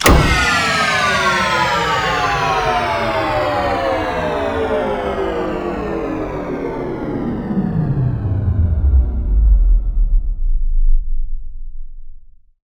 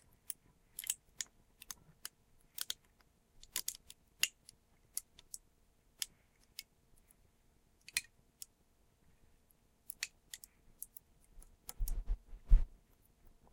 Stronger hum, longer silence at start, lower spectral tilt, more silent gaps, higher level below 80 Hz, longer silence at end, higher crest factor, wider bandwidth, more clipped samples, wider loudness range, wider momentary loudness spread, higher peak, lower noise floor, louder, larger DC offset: neither; second, 0 s vs 0.8 s; first, -5 dB/octave vs -1 dB/octave; neither; first, -18 dBFS vs -42 dBFS; second, 0.45 s vs 0.85 s; second, 16 dB vs 32 dB; first, over 20 kHz vs 17 kHz; neither; about the same, 6 LU vs 7 LU; second, 9 LU vs 21 LU; first, 0 dBFS vs -10 dBFS; second, -36 dBFS vs -72 dBFS; first, -17 LUFS vs -44 LUFS; neither